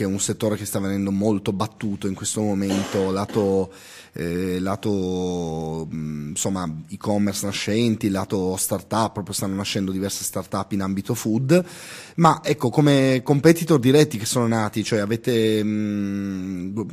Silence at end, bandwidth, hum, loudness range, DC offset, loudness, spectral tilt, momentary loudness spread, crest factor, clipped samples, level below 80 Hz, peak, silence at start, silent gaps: 0 s; 15.5 kHz; none; 7 LU; under 0.1%; -22 LUFS; -5.5 dB/octave; 11 LU; 20 dB; under 0.1%; -56 dBFS; -2 dBFS; 0 s; none